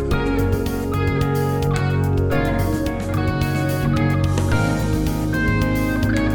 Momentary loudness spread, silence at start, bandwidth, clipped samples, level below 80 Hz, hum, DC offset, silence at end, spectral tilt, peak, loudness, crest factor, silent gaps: 3 LU; 0 s; over 20 kHz; under 0.1%; -28 dBFS; none; under 0.1%; 0 s; -7 dB/octave; -6 dBFS; -20 LUFS; 12 dB; none